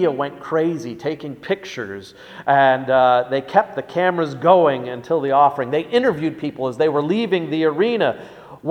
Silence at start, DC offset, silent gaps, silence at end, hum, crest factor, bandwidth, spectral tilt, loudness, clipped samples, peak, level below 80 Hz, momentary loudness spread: 0 s; under 0.1%; none; 0 s; none; 18 dB; 9.6 kHz; -6.5 dB/octave; -19 LUFS; under 0.1%; 0 dBFS; -62 dBFS; 14 LU